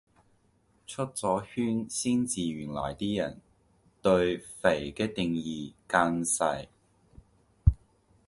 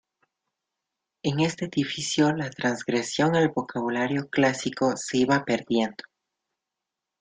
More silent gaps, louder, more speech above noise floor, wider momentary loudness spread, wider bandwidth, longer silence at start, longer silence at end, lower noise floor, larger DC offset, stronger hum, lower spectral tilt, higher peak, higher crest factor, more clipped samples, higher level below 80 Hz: neither; second, -30 LUFS vs -25 LUFS; second, 38 dB vs 61 dB; first, 11 LU vs 6 LU; first, 11.5 kHz vs 9.6 kHz; second, 0.9 s vs 1.25 s; second, 0.5 s vs 1.3 s; second, -68 dBFS vs -86 dBFS; neither; neither; about the same, -5 dB/octave vs -5 dB/octave; about the same, -6 dBFS vs -8 dBFS; about the same, 24 dB vs 20 dB; neither; first, -40 dBFS vs -64 dBFS